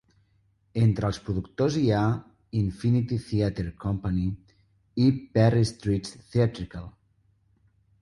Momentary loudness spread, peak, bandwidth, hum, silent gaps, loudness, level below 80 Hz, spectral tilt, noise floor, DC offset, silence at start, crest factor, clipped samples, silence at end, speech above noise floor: 12 LU; -10 dBFS; 11.5 kHz; none; none; -26 LUFS; -46 dBFS; -7.5 dB/octave; -66 dBFS; under 0.1%; 0.75 s; 16 dB; under 0.1%; 1.15 s; 42 dB